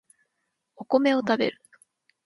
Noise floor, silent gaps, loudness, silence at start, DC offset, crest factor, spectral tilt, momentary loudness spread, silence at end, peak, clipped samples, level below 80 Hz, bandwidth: -79 dBFS; none; -24 LUFS; 0.8 s; under 0.1%; 20 dB; -5.5 dB/octave; 9 LU; 0.75 s; -8 dBFS; under 0.1%; -74 dBFS; 11.5 kHz